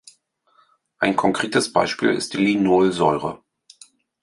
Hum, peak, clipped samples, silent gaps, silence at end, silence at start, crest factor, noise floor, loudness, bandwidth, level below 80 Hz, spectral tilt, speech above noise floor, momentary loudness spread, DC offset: none; -2 dBFS; under 0.1%; none; 0.85 s; 1 s; 20 dB; -61 dBFS; -20 LUFS; 11.5 kHz; -58 dBFS; -4.5 dB/octave; 42 dB; 8 LU; under 0.1%